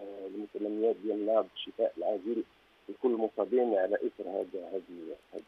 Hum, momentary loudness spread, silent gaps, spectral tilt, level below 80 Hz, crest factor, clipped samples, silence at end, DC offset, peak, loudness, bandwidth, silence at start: none; 13 LU; none; -7 dB/octave; -78 dBFS; 18 dB; under 0.1%; 0.05 s; under 0.1%; -14 dBFS; -33 LUFS; 5.8 kHz; 0 s